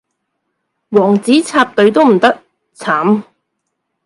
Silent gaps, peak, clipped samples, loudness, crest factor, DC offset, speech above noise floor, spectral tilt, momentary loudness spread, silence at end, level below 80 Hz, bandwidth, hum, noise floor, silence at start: none; 0 dBFS; under 0.1%; -12 LUFS; 14 dB; under 0.1%; 61 dB; -5.5 dB/octave; 8 LU; 0.85 s; -60 dBFS; 11.5 kHz; none; -72 dBFS; 0.9 s